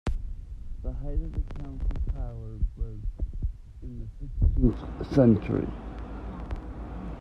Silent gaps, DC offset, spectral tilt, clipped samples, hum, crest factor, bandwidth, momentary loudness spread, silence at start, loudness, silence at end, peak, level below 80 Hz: none; under 0.1%; -10 dB/octave; under 0.1%; none; 22 dB; 6.2 kHz; 18 LU; 0.05 s; -30 LUFS; 0 s; -8 dBFS; -32 dBFS